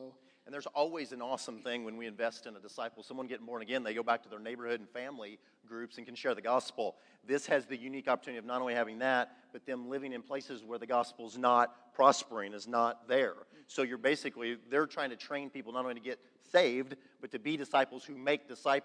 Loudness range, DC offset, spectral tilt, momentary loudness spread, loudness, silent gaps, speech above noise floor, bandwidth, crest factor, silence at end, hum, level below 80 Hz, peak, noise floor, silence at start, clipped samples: 8 LU; under 0.1%; -3.5 dB/octave; 15 LU; -35 LUFS; none; 18 dB; 10.5 kHz; 26 dB; 0 s; none; under -90 dBFS; -10 dBFS; -54 dBFS; 0 s; under 0.1%